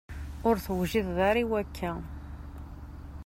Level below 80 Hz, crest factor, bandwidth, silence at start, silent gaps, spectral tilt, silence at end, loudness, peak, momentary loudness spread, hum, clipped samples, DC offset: -44 dBFS; 18 dB; 16 kHz; 0.1 s; none; -6.5 dB/octave; 0 s; -29 LUFS; -12 dBFS; 19 LU; none; under 0.1%; under 0.1%